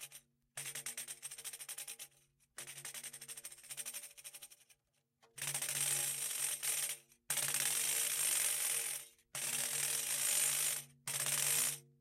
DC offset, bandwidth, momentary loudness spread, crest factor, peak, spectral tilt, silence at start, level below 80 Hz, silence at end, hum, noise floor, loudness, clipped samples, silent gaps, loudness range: under 0.1%; 16.5 kHz; 18 LU; 22 dB; -18 dBFS; 1 dB/octave; 0 s; -86 dBFS; 0.2 s; none; -80 dBFS; -36 LUFS; under 0.1%; none; 13 LU